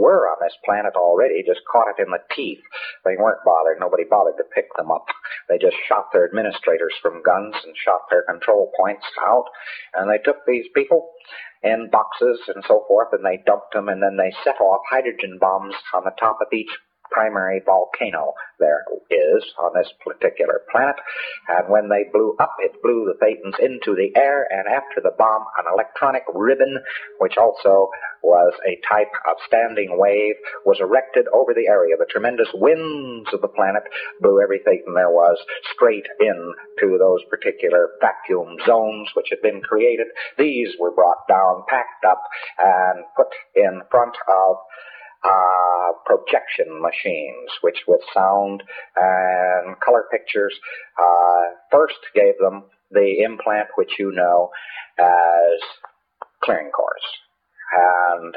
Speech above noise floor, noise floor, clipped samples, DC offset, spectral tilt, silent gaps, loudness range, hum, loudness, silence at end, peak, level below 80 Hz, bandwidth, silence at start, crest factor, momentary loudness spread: 24 dB; -42 dBFS; under 0.1%; under 0.1%; -9 dB/octave; none; 3 LU; none; -18 LUFS; 0.05 s; -2 dBFS; -70 dBFS; 5 kHz; 0 s; 16 dB; 9 LU